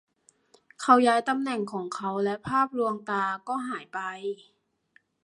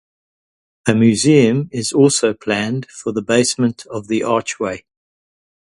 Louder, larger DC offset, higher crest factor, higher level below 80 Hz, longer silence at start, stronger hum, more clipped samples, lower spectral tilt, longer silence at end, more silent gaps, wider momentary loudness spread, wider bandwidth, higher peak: second, -27 LUFS vs -16 LUFS; neither; first, 24 dB vs 18 dB; second, -70 dBFS vs -54 dBFS; about the same, 0.8 s vs 0.85 s; neither; neither; about the same, -5 dB/octave vs -5 dB/octave; about the same, 0.9 s vs 0.8 s; neither; about the same, 14 LU vs 12 LU; about the same, 11.5 kHz vs 11.5 kHz; second, -4 dBFS vs 0 dBFS